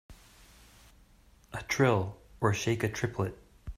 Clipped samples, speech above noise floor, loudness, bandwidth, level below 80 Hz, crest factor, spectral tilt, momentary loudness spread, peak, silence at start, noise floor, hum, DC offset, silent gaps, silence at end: under 0.1%; 31 dB; -31 LUFS; 15.5 kHz; -54 dBFS; 20 dB; -5.5 dB/octave; 16 LU; -12 dBFS; 0.1 s; -60 dBFS; none; under 0.1%; none; 0.05 s